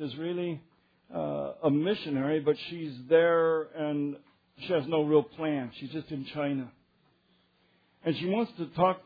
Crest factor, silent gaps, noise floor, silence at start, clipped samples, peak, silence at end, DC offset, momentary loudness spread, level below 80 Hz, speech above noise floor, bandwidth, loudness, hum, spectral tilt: 18 dB; none; -68 dBFS; 0 s; under 0.1%; -12 dBFS; 0.05 s; under 0.1%; 13 LU; -70 dBFS; 39 dB; 5 kHz; -30 LUFS; none; -5 dB/octave